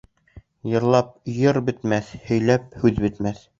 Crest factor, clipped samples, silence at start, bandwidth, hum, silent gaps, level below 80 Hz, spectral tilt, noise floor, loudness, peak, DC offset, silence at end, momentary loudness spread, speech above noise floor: 20 dB; under 0.1%; 0.35 s; 7.6 kHz; none; none; -46 dBFS; -7.5 dB/octave; -49 dBFS; -22 LUFS; -2 dBFS; under 0.1%; 0.2 s; 7 LU; 28 dB